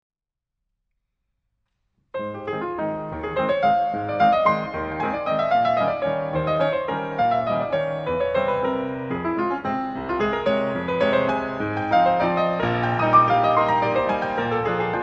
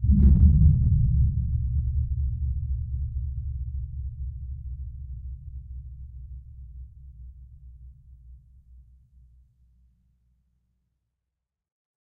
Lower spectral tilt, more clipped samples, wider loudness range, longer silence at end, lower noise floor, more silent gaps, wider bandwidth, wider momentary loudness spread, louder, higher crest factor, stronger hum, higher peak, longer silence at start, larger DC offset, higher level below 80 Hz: second, -7.5 dB/octave vs -14.5 dB/octave; neither; second, 6 LU vs 25 LU; second, 0 s vs 3.65 s; about the same, -84 dBFS vs -85 dBFS; neither; first, 7.4 kHz vs 0.8 kHz; second, 9 LU vs 26 LU; first, -22 LUFS vs -25 LUFS; about the same, 18 dB vs 20 dB; neither; about the same, -4 dBFS vs -6 dBFS; first, 2.15 s vs 0 s; neither; second, -50 dBFS vs -28 dBFS